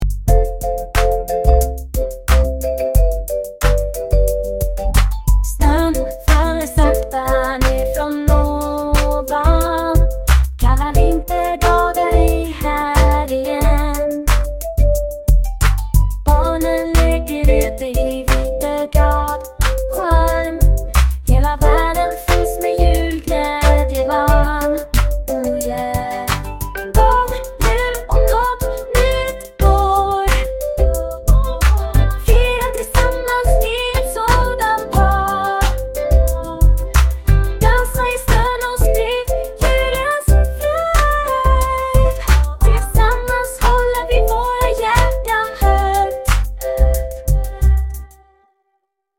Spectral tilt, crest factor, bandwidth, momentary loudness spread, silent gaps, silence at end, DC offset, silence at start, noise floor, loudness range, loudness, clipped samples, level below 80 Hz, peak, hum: -5.5 dB/octave; 14 dB; 17 kHz; 5 LU; none; 1.1 s; under 0.1%; 0 s; -70 dBFS; 2 LU; -17 LUFS; under 0.1%; -16 dBFS; 0 dBFS; none